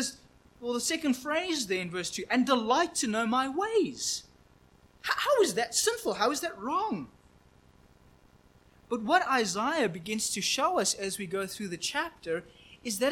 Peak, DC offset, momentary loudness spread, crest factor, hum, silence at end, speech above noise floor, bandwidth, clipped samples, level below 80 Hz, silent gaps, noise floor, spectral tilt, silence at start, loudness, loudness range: -10 dBFS; under 0.1%; 10 LU; 20 dB; none; 0 s; 31 dB; 17 kHz; under 0.1%; -64 dBFS; none; -60 dBFS; -2.5 dB/octave; 0 s; -29 LUFS; 4 LU